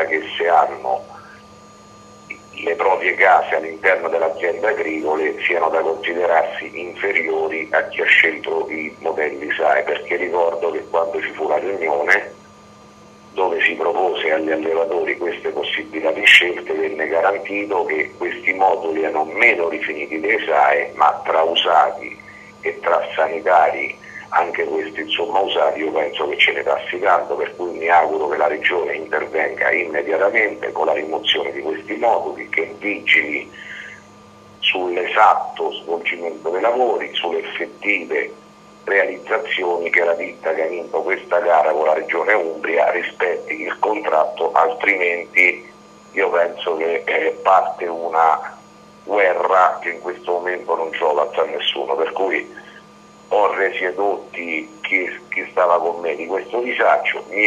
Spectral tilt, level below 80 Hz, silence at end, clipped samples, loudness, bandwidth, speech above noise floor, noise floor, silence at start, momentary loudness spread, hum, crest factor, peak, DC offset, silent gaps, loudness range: -3 dB/octave; -64 dBFS; 0 s; under 0.1%; -18 LUFS; 12.5 kHz; 26 dB; -45 dBFS; 0 s; 10 LU; none; 18 dB; 0 dBFS; under 0.1%; none; 4 LU